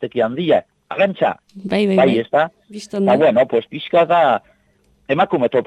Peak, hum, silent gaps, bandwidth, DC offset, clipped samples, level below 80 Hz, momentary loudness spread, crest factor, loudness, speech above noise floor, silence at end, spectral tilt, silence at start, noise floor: -2 dBFS; none; none; 10.5 kHz; under 0.1%; under 0.1%; -60 dBFS; 9 LU; 16 dB; -17 LUFS; 42 dB; 0 s; -7 dB/octave; 0 s; -58 dBFS